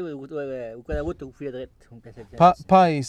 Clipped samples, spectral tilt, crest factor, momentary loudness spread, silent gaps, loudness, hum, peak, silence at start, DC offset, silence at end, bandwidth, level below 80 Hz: under 0.1%; -7 dB/octave; 20 dB; 19 LU; none; -22 LUFS; none; -4 dBFS; 0 s; under 0.1%; 0 s; 9.6 kHz; -44 dBFS